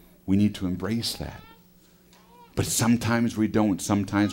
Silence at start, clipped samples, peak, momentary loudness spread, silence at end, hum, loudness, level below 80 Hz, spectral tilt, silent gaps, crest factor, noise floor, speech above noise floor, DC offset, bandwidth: 0.25 s; under 0.1%; -10 dBFS; 12 LU; 0 s; none; -25 LUFS; -50 dBFS; -5 dB/octave; none; 16 dB; -56 dBFS; 32 dB; under 0.1%; 16 kHz